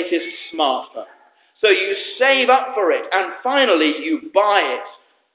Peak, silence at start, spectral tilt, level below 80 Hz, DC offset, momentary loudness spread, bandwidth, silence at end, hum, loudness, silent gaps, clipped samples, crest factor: -2 dBFS; 0 s; -5 dB/octave; -78 dBFS; under 0.1%; 10 LU; 4 kHz; 0.4 s; none; -17 LUFS; none; under 0.1%; 16 dB